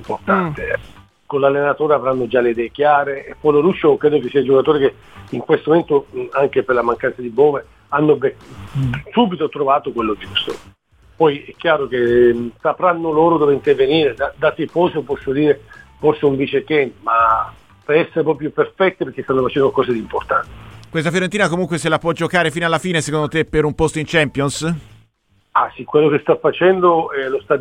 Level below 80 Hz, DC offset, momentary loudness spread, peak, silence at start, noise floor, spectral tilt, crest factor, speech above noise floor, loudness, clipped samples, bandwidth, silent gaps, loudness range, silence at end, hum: -46 dBFS; 0.1%; 8 LU; 0 dBFS; 0 s; -60 dBFS; -6 dB/octave; 16 dB; 43 dB; -17 LUFS; under 0.1%; 11.5 kHz; none; 3 LU; 0 s; none